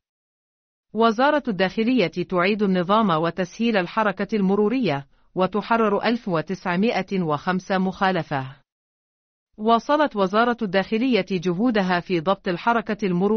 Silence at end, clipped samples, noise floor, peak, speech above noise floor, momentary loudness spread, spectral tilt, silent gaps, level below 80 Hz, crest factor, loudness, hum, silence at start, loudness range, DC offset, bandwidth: 0 s; under 0.1%; under -90 dBFS; -6 dBFS; over 69 dB; 6 LU; -4.5 dB/octave; 8.72-9.47 s; -58 dBFS; 16 dB; -22 LUFS; none; 0.95 s; 3 LU; under 0.1%; 6.6 kHz